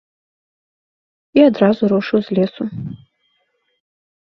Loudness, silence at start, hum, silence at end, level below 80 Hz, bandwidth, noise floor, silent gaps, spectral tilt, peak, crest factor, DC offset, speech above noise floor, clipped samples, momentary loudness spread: -16 LUFS; 1.35 s; none; 1.25 s; -58 dBFS; 6.2 kHz; -66 dBFS; none; -9 dB/octave; 0 dBFS; 18 dB; under 0.1%; 51 dB; under 0.1%; 15 LU